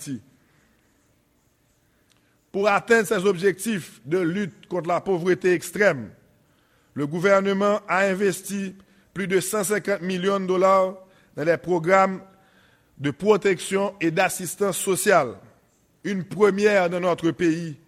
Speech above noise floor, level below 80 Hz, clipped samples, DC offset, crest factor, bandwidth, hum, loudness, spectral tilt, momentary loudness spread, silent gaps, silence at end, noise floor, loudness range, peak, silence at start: 42 dB; -64 dBFS; under 0.1%; under 0.1%; 20 dB; 16 kHz; none; -22 LUFS; -5 dB/octave; 12 LU; none; 0.15 s; -64 dBFS; 2 LU; -4 dBFS; 0 s